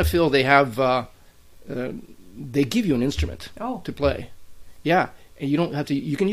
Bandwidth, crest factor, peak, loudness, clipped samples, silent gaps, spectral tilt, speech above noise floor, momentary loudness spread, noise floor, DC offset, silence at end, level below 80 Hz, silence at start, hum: 15.5 kHz; 22 dB; 0 dBFS; -23 LUFS; under 0.1%; none; -6 dB/octave; 26 dB; 16 LU; -48 dBFS; under 0.1%; 0 s; -38 dBFS; 0 s; none